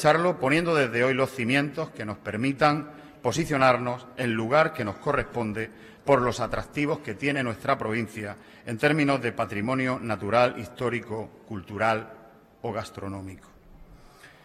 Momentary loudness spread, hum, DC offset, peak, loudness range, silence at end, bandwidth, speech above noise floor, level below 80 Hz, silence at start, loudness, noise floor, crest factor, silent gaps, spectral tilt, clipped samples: 14 LU; none; under 0.1%; -8 dBFS; 4 LU; 0.15 s; 15 kHz; 25 dB; -54 dBFS; 0 s; -26 LUFS; -51 dBFS; 20 dB; none; -6 dB/octave; under 0.1%